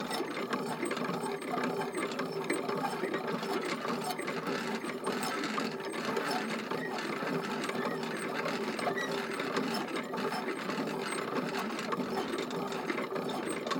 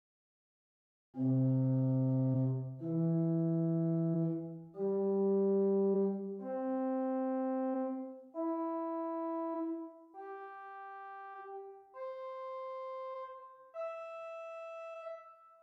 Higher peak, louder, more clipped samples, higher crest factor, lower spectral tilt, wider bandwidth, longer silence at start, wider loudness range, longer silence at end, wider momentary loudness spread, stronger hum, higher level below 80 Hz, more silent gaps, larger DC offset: first, -18 dBFS vs -24 dBFS; about the same, -35 LUFS vs -36 LUFS; neither; about the same, 16 dB vs 12 dB; second, -4 dB/octave vs -12 dB/octave; first, over 20 kHz vs 4.2 kHz; second, 0 s vs 1.15 s; second, 1 LU vs 12 LU; second, 0 s vs 0.15 s; second, 2 LU vs 17 LU; neither; first, -74 dBFS vs -86 dBFS; neither; neither